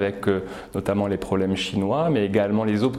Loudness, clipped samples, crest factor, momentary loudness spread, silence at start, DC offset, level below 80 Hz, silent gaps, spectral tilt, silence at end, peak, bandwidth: -23 LUFS; under 0.1%; 16 dB; 5 LU; 0 s; under 0.1%; -50 dBFS; none; -6.5 dB/octave; 0 s; -6 dBFS; 13.5 kHz